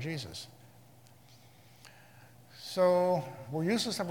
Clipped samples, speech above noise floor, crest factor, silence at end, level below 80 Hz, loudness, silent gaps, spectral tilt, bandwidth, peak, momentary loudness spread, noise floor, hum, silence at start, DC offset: under 0.1%; 28 dB; 18 dB; 0 s; -74 dBFS; -31 LUFS; none; -5 dB/octave; 18 kHz; -16 dBFS; 19 LU; -59 dBFS; none; 0 s; under 0.1%